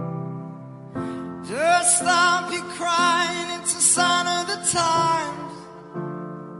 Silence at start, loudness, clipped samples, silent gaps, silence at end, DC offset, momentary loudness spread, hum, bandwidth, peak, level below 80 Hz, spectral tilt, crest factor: 0 s; -20 LUFS; under 0.1%; none; 0 s; under 0.1%; 19 LU; none; 11.5 kHz; -2 dBFS; -64 dBFS; -2 dB/octave; 20 dB